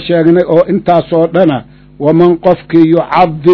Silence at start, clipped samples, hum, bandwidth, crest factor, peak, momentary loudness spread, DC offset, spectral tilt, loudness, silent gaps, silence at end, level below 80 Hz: 0 s; 3%; none; 6 kHz; 8 dB; 0 dBFS; 4 LU; under 0.1%; -9.5 dB/octave; -9 LUFS; none; 0 s; -42 dBFS